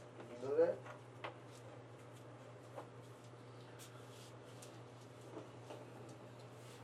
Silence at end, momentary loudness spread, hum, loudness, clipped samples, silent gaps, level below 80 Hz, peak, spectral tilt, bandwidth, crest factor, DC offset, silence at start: 0 s; 18 LU; none; -48 LUFS; under 0.1%; none; -86 dBFS; -24 dBFS; -6 dB/octave; 14 kHz; 24 dB; under 0.1%; 0 s